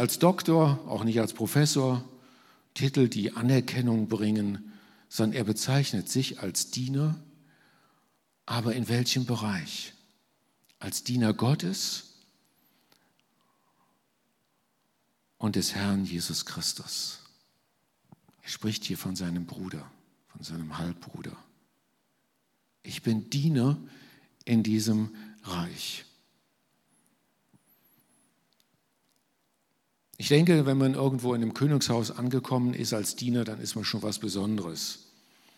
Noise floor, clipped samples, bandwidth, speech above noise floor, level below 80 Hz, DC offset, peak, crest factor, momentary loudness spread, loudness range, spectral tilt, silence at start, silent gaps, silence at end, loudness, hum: -75 dBFS; under 0.1%; 16.5 kHz; 47 dB; -68 dBFS; under 0.1%; -8 dBFS; 22 dB; 15 LU; 11 LU; -5 dB/octave; 0 s; none; 0.6 s; -28 LUFS; none